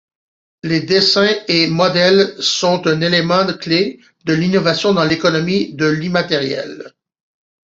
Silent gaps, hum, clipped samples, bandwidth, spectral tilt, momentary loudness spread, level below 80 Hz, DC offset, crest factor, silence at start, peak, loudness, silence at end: none; none; under 0.1%; 7.8 kHz; -4.5 dB/octave; 9 LU; -54 dBFS; under 0.1%; 16 dB; 0.65 s; 0 dBFS; -15 LUFS; 0.8 s